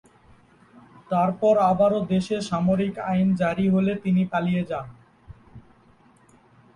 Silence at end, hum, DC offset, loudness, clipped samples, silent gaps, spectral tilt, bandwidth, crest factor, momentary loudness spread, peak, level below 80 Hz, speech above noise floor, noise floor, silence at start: 1.15 s; none; under 0.1%; -23 LUFS; under 0.1%; none; -8 dB/octave; 10.5 kHz; 16 dB; 7 LU; -8 dBFS; -56 dBFS; 34 dB; -56 dBFS; 1.1 s